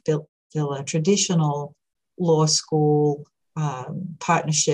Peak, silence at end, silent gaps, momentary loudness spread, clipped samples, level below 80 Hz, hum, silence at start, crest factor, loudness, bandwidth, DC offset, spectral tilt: -8 dBFS; 0 s; 0.29-0.50 s; 13 LU; under 0.1%; -70 dBFS; none; 0.05 s; 16 dB; -22 LUFS; 11 kHz; under 0.1%; -4.5 dB/octave